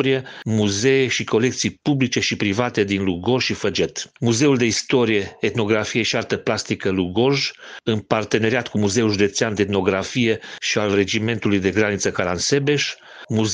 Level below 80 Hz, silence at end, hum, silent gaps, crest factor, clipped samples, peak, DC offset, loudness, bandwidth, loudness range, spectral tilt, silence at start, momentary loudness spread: -54 dBFS; 0 s; none; none; 20 dB; under 0.1%; 0 dBFS; under 0.1%; -20 LUFS; 10 kHz; 1 LU; -4.5 dB/octave; 0 s; 5 LU